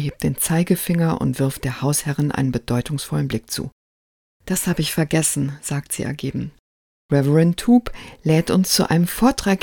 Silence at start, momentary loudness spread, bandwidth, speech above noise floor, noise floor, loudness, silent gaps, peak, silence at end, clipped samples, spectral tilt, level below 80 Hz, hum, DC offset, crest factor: 0 s; 10 LU; 18 kHz; over 70 dB; under -90 dBFS; -20 LUFS; 3.72-4.40 s, 6.59-7.09 s; -2 dBFS; 0 s; under 0.1%; -5 dB/octave; -44 dBFS; none; under 0.1%; 18 dB